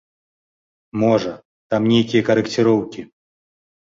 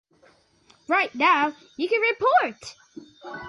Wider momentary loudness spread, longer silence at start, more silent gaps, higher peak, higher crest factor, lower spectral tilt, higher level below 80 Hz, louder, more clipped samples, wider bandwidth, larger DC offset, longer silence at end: second, 14 LU vs 21 LU; about the same, 0.95 s vs 0.9 s; first, 1.45-1.70 s vs none; first, -4 dBFS vs -8 dBFS; about the same, 18 dB vs 18 dB; first, -6.5 dB/octave vs -3.5 dB/octave; first, -56 dBFS vs -70 dBFS; first, -18 LUFS vs -22 LUFS; neither; second, 7.8 kHz vs 11.5 kHz; neither; first, 0.9 s vs 0 s